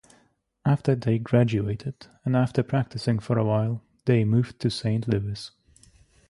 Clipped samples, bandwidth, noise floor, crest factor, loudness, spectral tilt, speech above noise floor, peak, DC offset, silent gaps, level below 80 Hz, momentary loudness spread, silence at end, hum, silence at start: under 0.1%; 11.5 kHz; -65 dBFS; 18 dB; -25 LUFS; -8 dB/octave; 41 dB; -8 dBFS; under 0.1%; none; -54 dBFS; 11 LU; 0.8 s; none; 0.65 s